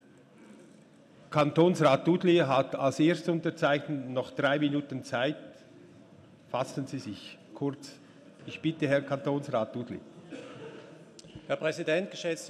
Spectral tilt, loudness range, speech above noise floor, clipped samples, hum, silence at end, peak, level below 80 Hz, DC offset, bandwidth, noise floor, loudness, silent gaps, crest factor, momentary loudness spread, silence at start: -6 dB/octave; 10 LU; 28 dB; under 0.1%; none; 0 s; -10 dBFS; -74 dBFS; under 0.1%; 12.5 kHz; -56 dBFS; -29 LUFS; none; 20 dB; 21 LU; 0.4 s